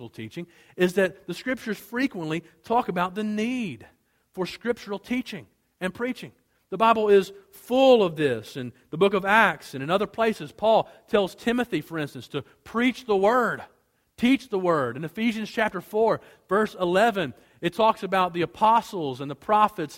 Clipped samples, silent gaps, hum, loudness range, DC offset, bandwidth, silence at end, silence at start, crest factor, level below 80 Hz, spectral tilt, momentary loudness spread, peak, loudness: under 0.1%; none; none; 7 LU; under 0.1%; 16.5 kHz; 0 s; 0 s; 22 dB; -62 dBFS; -5.5 dB/octave; 15 LU; -4 dBFS; -24 LUFS